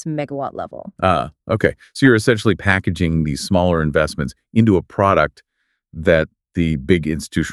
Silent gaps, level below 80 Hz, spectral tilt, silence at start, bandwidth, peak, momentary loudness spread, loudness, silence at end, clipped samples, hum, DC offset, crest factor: none; -38 dBFS; -6.5 dB/octave; 0 s; 13 kHz; 0 dBFS; 10 LU; -18 LUFS; 0 s; under 0.1%; none; under 0.1%; 18 dB